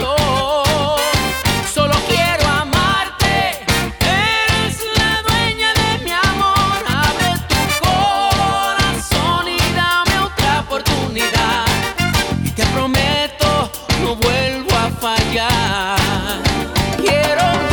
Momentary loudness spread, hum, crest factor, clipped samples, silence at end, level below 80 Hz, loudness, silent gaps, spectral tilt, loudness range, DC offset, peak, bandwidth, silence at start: 3 LU; none; 12 dB; under 0.1%; 0 s; -30 dBFS; -15 LUFS; none; -4 dB/octave; 1 LU; under 0.1%; -4 dBFS; over 20 kHz; 0 s